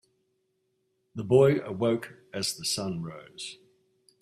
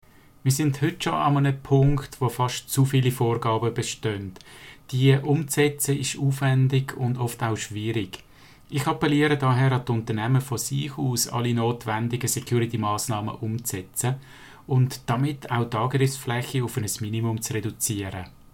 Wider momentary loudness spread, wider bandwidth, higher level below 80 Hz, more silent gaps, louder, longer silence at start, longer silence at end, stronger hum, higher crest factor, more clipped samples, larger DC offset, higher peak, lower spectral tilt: first, 19 LU vs 8 LU; second, 14 kHz vs 17 kHz; second, -66 dBFS vs -50 dBFS; neither; about the same, -27 LUFS vs -25 LUFS; first, 1.15 s vs 0.45 s; first, 0.65 s vs 0.25 s; neither; about the same, 22 dB vs 18 dB; neither; second, under 0.1% vs 0.1%; about the same, -8 dBFS vs -6 dBFS; about the same, -5 dB/octave vs -5.5 dB/octave